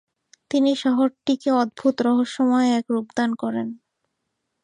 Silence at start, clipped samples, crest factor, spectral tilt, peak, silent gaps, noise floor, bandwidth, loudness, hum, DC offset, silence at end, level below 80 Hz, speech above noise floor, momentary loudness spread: 0.5 s; under 0.1%; 14 dB; -5 dB/octave; -8 dBFS; none; -77 dBFS; 10 kHz; -22 LUFS; none; under 0.1%; 0.9 s; -72 dBFS; 57 dB; 6 LU